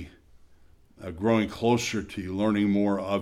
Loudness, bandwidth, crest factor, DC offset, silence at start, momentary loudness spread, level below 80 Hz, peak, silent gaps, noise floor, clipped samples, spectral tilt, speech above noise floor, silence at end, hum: -26 LUFS; 13.5 kHz; 18 dB; under 0.1%; 0 s; 15 LU; -54 dBFS; -10 dBFS; none; -55 dBFS; under 0.1%; -6 dB/octave; 30 dB; 0 s; none